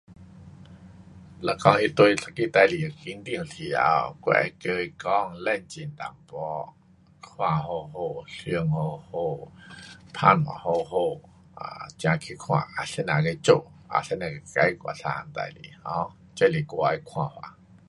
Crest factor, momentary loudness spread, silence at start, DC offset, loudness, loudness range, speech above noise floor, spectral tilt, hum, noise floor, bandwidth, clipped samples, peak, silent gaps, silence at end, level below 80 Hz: 26 dB; 18 LU; 0.1 s; under 0.1%; -26 LUFS; 7 LU; 26 dB; -6 dB/octave; none; -51 dBFS; 11.5 kHz; under 0.1%; -2 dBFS; none; 0.4 s; -58 dBFS